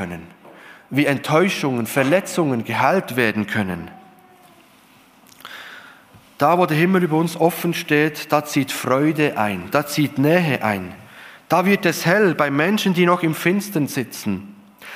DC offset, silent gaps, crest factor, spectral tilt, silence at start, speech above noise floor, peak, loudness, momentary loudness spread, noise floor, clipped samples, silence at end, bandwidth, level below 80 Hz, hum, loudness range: under 0.1%; none; 18 dB; -5.5 dB/octave; 0 s; 32 dB; -2 dBFS; -19 LUFS; 11 LU; -51 dBFS; under 0.1%; 0 s; 15.5 kHz; -62 dBFS; none; 5 LU